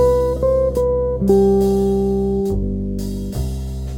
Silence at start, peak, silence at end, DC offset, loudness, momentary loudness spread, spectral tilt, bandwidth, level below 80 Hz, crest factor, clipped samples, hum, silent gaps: 0 s; -2 dBFS; 0 s; under 0.1%; -18 LUFS; 10 LU; -8.5 dB/octave; 17 kHz; -26 dBFS; 16 dB; under 0.1%; none; none